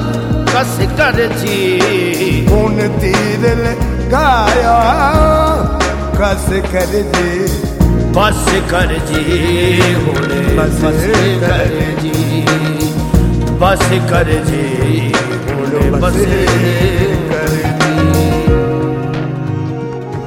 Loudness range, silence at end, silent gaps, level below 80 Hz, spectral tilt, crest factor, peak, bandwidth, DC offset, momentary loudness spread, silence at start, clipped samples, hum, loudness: 2 LU; 0 s; none; -20 dBFS; -5.5 dB/octave; 12 dB; 0 dBFS; 17.5 kHz; under 0.1%; 5 LU; 0 s; under 0.1%; none; -13 LUFS